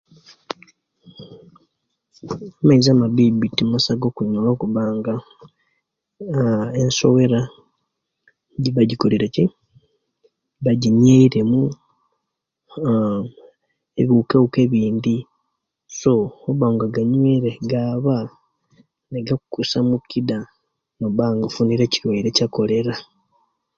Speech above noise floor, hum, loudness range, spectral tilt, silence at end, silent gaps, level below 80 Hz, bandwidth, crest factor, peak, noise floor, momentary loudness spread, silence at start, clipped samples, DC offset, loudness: 62 dB; none; 4 LU; -6.5 dB/octave; 0.75 s; none; -54 dBFS; 7.4 kHz; 18 dB; 0 dBFS; -79 dBFS; 16 LU; 1.2 s; under 0.1%; under 0.1%; -19 LUFS